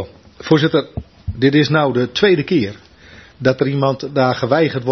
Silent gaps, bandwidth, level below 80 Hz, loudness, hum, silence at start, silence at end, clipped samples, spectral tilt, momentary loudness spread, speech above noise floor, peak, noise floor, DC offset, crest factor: none; 6.4 kHz; -44 dBFS; -16 LUFS; none; 0 s; 0 s; under 0.1%; -7 dB/octave; 15 LU; 27 dB; 0 dBFS; -43 dBFS; under 0.1%; 16 dB